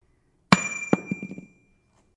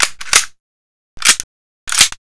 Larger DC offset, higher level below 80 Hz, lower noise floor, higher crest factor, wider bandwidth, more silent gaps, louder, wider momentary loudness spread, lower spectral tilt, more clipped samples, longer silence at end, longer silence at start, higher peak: neither; second, -62 dBFS vs -42 dBFS; second, -65 dBFS vs under -90 dBFS; first, 28 dB vs 18 dB; about the same, 11.5 kHz vs 11 kHz; second, none vs 0.60-1.17 s, 1.44-1.87 s; second, -24 LUFS vs -12 LUFS; first, 18 LU vs 14 LU; first, -4.5 dB/octave vs 2 dB/octave; second, under 0.1% vs 0.6%; first, 0.75 s vs 0.1 s; first, 0.5 s vs 0 s; about the same, 0 dBFS vs 0 dBFS